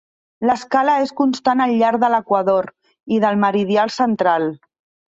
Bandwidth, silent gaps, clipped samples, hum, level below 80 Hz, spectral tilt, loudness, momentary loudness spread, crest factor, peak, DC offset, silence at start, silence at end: 8 kHz; none; under 0.1%; none; -62 dBFS; -6 dB/octave; -17 LUFS; 5 LU; 16 dB; -2 dBFS; under 0.1%; 0.4 s; 0.5 s